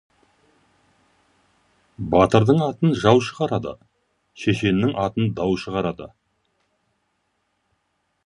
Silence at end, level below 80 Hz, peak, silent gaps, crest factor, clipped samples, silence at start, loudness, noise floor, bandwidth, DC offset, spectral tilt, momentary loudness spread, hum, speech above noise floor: 2.2 s; -48 dBFS; 0 dBFS; none; 22 dB; under 0.1%; 2 s; -20 LUFS; -72 dBFS; 11 kHz; under 0.1%; -7 dB/octave; 13 LU; none; 52 dB